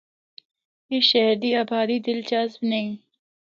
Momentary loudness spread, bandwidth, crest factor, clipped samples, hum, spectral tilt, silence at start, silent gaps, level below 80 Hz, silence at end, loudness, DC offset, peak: 11 LU; 7.4 kHz; 20 dB; under 0.1%; none; -5 dB/octave; 0.9 s; none; -76 dBFS; 0.55 s; -22 LUFS; under 0.1%; -6 dBFS